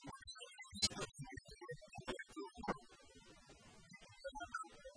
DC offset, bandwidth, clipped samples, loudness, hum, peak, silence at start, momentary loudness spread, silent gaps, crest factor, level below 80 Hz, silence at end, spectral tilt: under 0.1%; 10.5 kHz; under 0.1%; -47 LUFS; none; -22 dBFS; 0 s; 23 LU; none; 28 dB; -66 dBFS; 0 s; -2.5 dB/octave